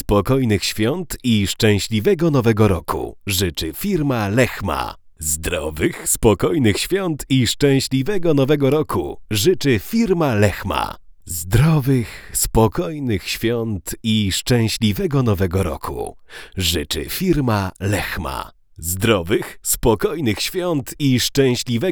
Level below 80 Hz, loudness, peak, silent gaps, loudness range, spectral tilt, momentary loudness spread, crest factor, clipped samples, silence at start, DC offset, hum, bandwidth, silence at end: -36 dBFS; -19 LUFS; 0 dBFS; none; 3 LU; -5 dB/octave; 9 LU; 18 dB; under 0.1%; 0.1 s; under 0.1%; none; over 20 kHz; 0 s